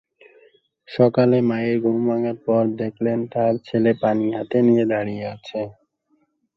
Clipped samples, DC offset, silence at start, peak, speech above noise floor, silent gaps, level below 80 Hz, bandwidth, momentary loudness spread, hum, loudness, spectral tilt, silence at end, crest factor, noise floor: under 0.1%; under 0.1%; 0.9 s; -2 dBFS; 46 dB; none; -62 dBFS; 6 kHz; 12 LU; none; -20 LUFS; -9.5 dB/octave; 0.85 s; 18 dB; -66 dBFS